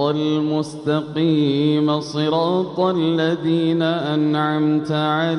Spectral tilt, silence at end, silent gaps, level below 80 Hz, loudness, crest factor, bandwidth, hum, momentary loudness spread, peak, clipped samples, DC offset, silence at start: -7 dB/octave; 0 s; none; -66 dBFS; -19 LUFS; 12 dB; 10.5 kHz; none; 3 LU; -6 dBFS; under 0.1%; under 0.1%; 0 s